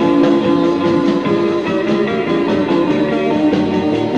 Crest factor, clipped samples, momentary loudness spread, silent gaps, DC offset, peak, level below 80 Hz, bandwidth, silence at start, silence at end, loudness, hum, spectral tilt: 12 dB; under 0.1%; 3 LU; none; 0.2%; -2 dBFS; -50 dBFS; 8.2 kHz; 0 s; 0 s; -15 LUFS; none; -7 dB/octave